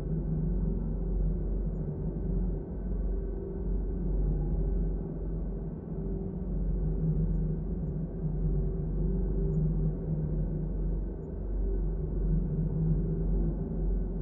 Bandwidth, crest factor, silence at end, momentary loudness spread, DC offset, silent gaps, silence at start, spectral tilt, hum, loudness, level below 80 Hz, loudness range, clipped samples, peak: 1.7 kHz; 14 dB; 0 s; 6 LU; under 0.1%; none; 0 s; -14 dB/octave; none; -33 LUFS; -32 dBFS; 2 LU; under 0.1%; -16 dBFS